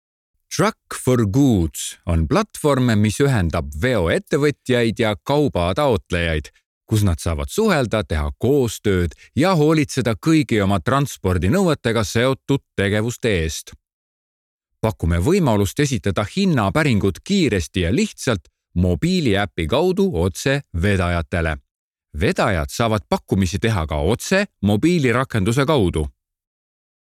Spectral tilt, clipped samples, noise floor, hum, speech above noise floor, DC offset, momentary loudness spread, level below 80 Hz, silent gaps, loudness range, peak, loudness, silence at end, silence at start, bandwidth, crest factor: -6 dB/octave; under 0.1%; under -90 dBFS; none; over 71 dB; under 0.1%; 6 LU; -38 dBFS; 6.66-6.81 s, 13.93-14.59 s, 21.71-21.91 s; 3 LU; -4 dBFS; -19 LUFS; 1 s; 0.5 s; 15.5 kHz; 14 dB